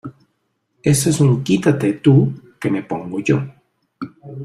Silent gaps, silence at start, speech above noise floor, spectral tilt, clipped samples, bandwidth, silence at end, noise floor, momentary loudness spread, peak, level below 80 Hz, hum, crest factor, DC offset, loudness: none; 0.05 s; 53 dB; -6.5 dB/octave; under 0.1%; 15 kHz; 0 s; -69 dBFS; 19 LU; -2 dBFS; -52 dBFS; none; 16 dB; under 0.1%; -17 LUFS